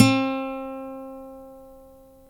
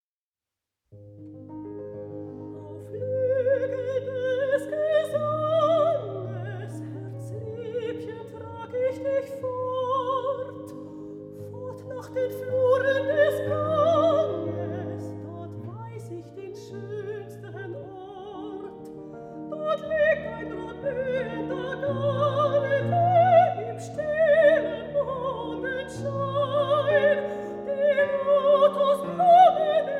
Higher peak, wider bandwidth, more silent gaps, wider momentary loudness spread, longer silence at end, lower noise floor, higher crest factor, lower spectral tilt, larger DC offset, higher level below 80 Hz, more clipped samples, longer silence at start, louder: first, 0 dBFS vs -6 dBFS; about the same, 14 kHz vs 13 kHz; neither; first, 24 LU vs 19 LU; first, 0.5 s vs 0 s; second, -50 dBFS vs under -90 dBFS; first, 26 dB vs 18 dB; second, -5.5 dB/octave vs -7 dB/octave; neither; first, -54 dBFS vs -62 dBFS; neither; second, 0 s vs 0.95 s; second, -27 LUFS vs -24 LUFS